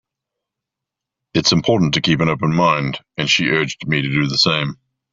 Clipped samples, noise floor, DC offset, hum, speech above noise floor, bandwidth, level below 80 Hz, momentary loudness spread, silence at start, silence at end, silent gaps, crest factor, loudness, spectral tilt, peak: under 0.1%; -84 dBFS; under 0.1%; none; 67 dB; 7.8 kHz; -50 dBFS; 7 LU; 1.35 s; 0.4 s; none; 16 dB; -17 LUFS; -4.5 dB/octave; -2 dBFS